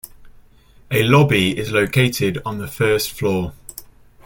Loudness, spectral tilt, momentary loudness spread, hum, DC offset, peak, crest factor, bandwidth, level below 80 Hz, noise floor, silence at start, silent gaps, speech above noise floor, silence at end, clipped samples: -18 LUFS; -5.5 dB/octave; 16 LU; none; under 0.1%; -2 dBFS; 18 dB; 17 kHz; -46 dBFS; -48 dBFS; 0.05 s; none; 31 dB; 0.4 s; under 0.1%